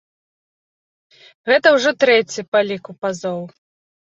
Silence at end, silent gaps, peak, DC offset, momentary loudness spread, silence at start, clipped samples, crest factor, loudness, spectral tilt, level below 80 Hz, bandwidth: 0.65 s; 2.48-2.52 s; -2 dBFS; under 0.1%; 15 LU; 1.45 s; under 0.1%; 18 dB; -17 LUFS; -3.5 dB/octave; -68 dBFS; 8 kHz